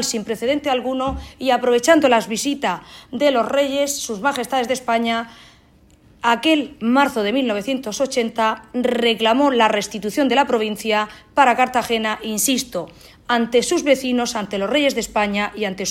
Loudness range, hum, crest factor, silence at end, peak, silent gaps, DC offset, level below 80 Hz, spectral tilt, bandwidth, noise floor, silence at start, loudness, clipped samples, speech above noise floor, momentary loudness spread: 3 LU; none; 18 dB; 0 s; -2 dBFS; none; under 0.1%; -48 dBFS; -3 dB/octave; 16.5 kHz; -52 dBFS; 0 s; -19 LUFS; under 0.1%; 33 dB; 8 LU